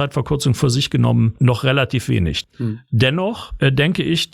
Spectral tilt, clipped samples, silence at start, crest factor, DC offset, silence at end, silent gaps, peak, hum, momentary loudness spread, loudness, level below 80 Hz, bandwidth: -6 dB/octave; under 0.1%; 0 s; 16 dB; under 0.1%; 0.1 s; none; -2 dBFS; none; 7 LU; -18 LUFS; -40 dBFS; 14.5 kHz